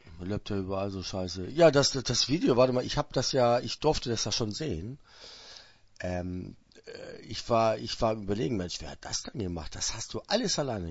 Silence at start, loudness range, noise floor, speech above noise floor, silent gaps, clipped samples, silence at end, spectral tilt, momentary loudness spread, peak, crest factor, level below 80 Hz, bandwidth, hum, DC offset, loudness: 0.05 s; 8 LU; -53 dBFS; 24 dB; none; under 0.1%; 0 s; -4.5 dB/octave; 20 LU; -8 dBFS; 22 dB; -50 dBFS; 8 kHz; none; under 0.1%; -29 LUFS